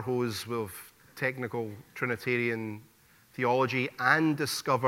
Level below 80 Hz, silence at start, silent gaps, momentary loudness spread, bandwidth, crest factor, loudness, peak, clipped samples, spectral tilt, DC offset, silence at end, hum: -72 dBFS; 0 s; none; 15 LU; 16.5 kHz; 22 dB; -30 LUFS; -10 dBFS; under 0.1%; -5 dB/octave; under 0.1%; 0 s; none